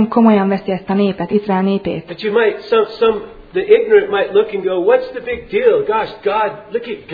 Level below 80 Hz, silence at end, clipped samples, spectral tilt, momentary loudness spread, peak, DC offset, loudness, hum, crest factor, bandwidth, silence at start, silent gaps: -48 dBFS; 0 s; under 0.1%; -9 dB/octave; 12 LU; 0 dBFS; under 0.1%; -15 LUFS; none; 14 dB; 5 kHz; 0 s; none